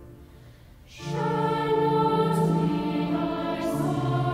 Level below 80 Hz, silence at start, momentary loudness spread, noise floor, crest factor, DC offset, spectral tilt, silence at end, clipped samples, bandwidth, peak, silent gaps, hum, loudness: -52 dBFS; 0 s; 6 LU; -49 dBFS; 14 dB; under 0.1%; -7.5 dB/octave; 0 s; under 0.1%; 15.5 kHz; -12 dBFS; none; none; -25 LUFS